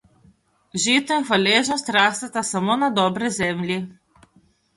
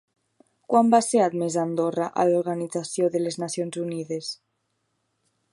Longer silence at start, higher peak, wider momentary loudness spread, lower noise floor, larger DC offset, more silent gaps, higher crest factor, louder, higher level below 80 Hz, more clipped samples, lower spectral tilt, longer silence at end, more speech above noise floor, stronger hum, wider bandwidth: about the same, 0.75 s vs 0.7 s; about the same, -4 dBFS vs -4 dBFS; second, 9 LU vs 12 LU; second, -59 dBFS vs -75 dBFS; neither; neither; about the same, 20 dB vs 20 dB; first, -20 LUFS vs -24 LUFS; first, -60 dBFS vs -76 dBFS; neither; second, -3 dB/octave vs -5 dB/octave; second, 0.85 s vs 1.2 s; second, 39 dB vs 51 dB; neither; about the same, 11.5 kHz vs 11.5 kHz